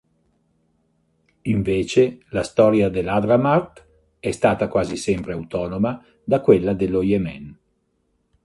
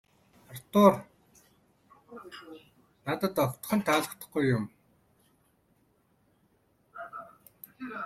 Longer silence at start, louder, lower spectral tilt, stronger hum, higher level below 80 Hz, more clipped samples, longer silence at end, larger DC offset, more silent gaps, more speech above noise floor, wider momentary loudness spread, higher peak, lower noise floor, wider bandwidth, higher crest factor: first, 1.45 s vs 0.5 s; first, -20 LUFS vs -28 LUFS; about the same, -7 dB/octave vs -6 dB/octave; neither; first, -46 dBFS vs -68 dBFS; neither; first, 0.9 s vs 0 s; neither; neither; first, 49 dB vs 42 dB; second, 12 LU vs 28 LU; first, 0 dBFS vs -6 dBFS; about the same, -68 dBFS vs -69 dBFS; second, 11.5 kHz vs 16 kHz; second, 20 dB vs 26 dB